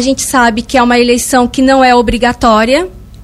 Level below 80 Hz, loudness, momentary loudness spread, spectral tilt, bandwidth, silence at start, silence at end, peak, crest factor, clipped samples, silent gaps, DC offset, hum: -28 dBFS; -9 LUFS; 4 LU; -3.5 dB/octave; 15.5 kHz; 0 s; 0 s; 0 dBFS; 10 dB; 0.2%; none; under 0.1%; none